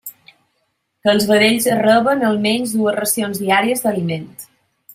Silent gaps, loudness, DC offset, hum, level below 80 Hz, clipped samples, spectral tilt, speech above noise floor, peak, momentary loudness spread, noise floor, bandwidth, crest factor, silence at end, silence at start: none; -16 LUFS; under 0.1%; none; -60 dBFS; under 0.1%; -4 dB/octave; 53 dB; 0 dBFS; 12 LU; -69 dBFS; 16 kHz; 16 dB; 0.5 s; 0.05 s